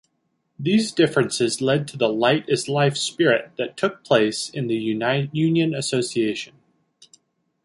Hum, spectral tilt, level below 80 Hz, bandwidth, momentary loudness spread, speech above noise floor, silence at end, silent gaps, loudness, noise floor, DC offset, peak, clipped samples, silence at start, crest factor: none; -5 dB/octave; -64 dBFS; 11.5 kHz; 6 LU; 51 dB; 1.2 s; none; -21 LUFS; -72 dBFS; under 0.1%; -4 dBFS; under 0.1%; 0.6 s; 18 dB